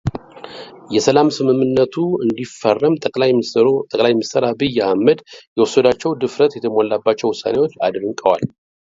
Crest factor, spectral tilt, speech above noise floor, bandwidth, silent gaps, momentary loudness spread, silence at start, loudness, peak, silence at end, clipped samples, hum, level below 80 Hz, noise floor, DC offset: 16 dB; -5.5 dB/octave; 19 dB; 7.8 kHz; 5.47-5.56 s; 7 LU; 0.05 s; -17 LUFS; 0 dBFS; 0.35 s; under 0.1%; none; -50 dBFS; -35 dBFS; under 0.1%